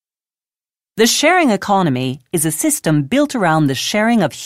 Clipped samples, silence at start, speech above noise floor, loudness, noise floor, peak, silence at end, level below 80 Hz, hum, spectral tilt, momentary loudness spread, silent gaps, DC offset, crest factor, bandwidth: under 0.1%; 0.95 s; over 75 dB; -15 LUFS; under -90 dBFS; -2 dBFS; 0 s; -56 dBFS; none; -4 dB/octave; 6 LU; none; under 0.1%; 14 dB; 16 kHz